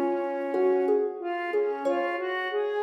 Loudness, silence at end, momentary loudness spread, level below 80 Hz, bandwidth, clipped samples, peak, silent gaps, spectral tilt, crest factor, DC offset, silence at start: -27 LUFS; 0 s; 5 LU; under -90 dBFS; 7.8 kHz; under 0.1%; -14 dBFS; none; -4.5 dB/octave; 12 dB; under 0.1%; 0 s